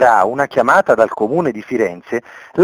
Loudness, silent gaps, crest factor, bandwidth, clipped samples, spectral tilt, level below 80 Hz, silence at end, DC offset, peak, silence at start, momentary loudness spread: -15 LUFS; none; 14 dB; 18.5 kHz; under 0.1%; -6 dB/octave; -56 dBFS; 0 s; under 0.1%; 0 dBFS; 0 s; 12 LU